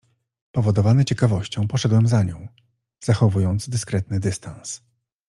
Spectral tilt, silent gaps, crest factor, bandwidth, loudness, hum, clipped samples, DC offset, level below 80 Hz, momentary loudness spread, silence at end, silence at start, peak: -6.5 dB/octave; none; 18 dB; 11.5 kHz; -21 LUFS; none; under 0.1%; under 0.1%; -52 dBFS; 15 LU; 0.5 s; 0.55 s; -4 dBFS